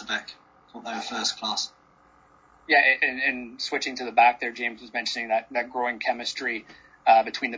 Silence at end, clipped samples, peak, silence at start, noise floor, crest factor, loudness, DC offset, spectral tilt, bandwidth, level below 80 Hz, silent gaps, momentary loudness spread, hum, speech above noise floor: 0 s; under 0.1%; -6 dBFS; 0 s; -58 dBFS; 20 dB; -24 LUFS; under 0.1%; -1 dB/octave; 7.8 kHz; -68 dBFS; none; 12 LU; none; 33 dB